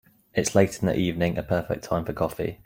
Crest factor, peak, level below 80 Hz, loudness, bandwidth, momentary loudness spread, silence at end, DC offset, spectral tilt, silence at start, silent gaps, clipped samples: 22 dB; -4 dBFS; -48 dBFS; -25 LUFS; 16.5 kHz; 7 LU; 0.1 s; under 0.1%; -5.5 dB/octave; 0.35 s; none; under 0.1%